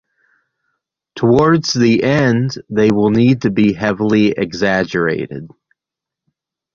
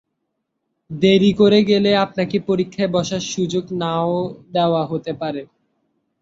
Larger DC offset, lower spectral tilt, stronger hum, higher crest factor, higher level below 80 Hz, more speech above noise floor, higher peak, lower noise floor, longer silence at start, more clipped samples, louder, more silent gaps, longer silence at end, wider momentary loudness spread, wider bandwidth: neither; about the same, -6.5 dB/octave vs -6 dB/octave; neither; about the same, 14 dB vs 18 dB; first, -48 dBFS vs -56 dBFS; first, 71 dB vs 57 dB; about the same, -2 dBFS vs -2 dBFS; first, -85 dBFS vs -75 dBFS; first, 1.15 s vs 0.9 s; neither; first, -14 LUFS vs -18 LUFS; neither; first, 1.25 s vs 0.75 s; second, 6 LU vs 11 LU; about the same, 7.4 kHz vs 7.8 kHz